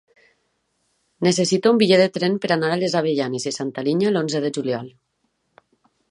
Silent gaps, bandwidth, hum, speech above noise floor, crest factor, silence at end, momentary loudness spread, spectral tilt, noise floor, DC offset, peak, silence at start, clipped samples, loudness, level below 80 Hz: none; 11.5 kHz; none; 51 dB; 18 dB; 1.2 s; 10 LU; -5 dB/octave; -71 dBFS; under 0.1%; -4 dBFS; 1.2 s; under 0.1%; -20 LUFS; -68 dBFS